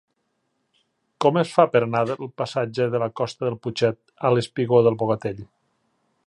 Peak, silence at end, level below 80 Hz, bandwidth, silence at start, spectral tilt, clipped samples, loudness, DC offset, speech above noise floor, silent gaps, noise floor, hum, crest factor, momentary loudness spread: -2 dBFS; 0.8 s; -62 dBFS; 11 kHz; 1.2 s; -6.5 dB/octave; under 0.1%; -22 LUFS; under 0.1%; 51 dB; none; -73 dBFS; none; 22 dB; 9 LU